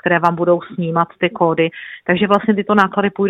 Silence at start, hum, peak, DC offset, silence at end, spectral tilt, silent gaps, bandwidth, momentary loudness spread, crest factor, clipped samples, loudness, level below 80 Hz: 0.05 s; none; 0 dBFS; under 0.1%; 0 s; -8 dB/octave; none; 7 kHz; 5 LU; 16 dB; under 0.1%; -16 LUFS; -56 dBFS